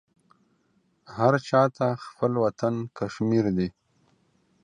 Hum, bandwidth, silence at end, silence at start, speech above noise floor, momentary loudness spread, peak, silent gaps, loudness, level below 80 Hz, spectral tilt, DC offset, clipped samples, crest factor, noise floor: none; 9.8 kHz; 0.95 s; 1.1 s; 44 dB; 10 LU; -6 dBFS; none; -25 LUFS; -58 dBFS; -7.5 dB/octave; under 0.1%; under 0.1%; 22 dB; -68 dBFS